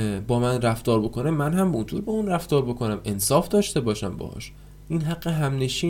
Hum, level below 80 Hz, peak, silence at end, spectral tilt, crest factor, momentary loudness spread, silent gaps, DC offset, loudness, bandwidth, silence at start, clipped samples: none; -44 dBFS; -6 dBFS; 0 s; -5.5 dB/octave; 18 dB; 8 LU; none; under 0.1%; -24 LUFS; 17.5 kHz; 0 s; under 0.1%